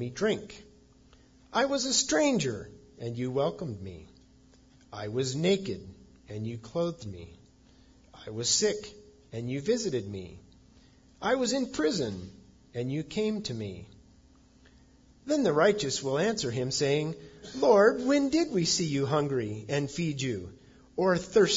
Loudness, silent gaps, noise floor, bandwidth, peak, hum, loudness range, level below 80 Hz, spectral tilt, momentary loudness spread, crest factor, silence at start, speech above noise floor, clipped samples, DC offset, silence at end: -29 LUFS; none; -59 dBFS; 7.8 kHz; -10 dBFS; none; 8 LU; -60 dBFS; -4 dB/octave; 19 LU; 20 dB; 0 s; 30 dB; under 0.1%; under 0.1%; 0 s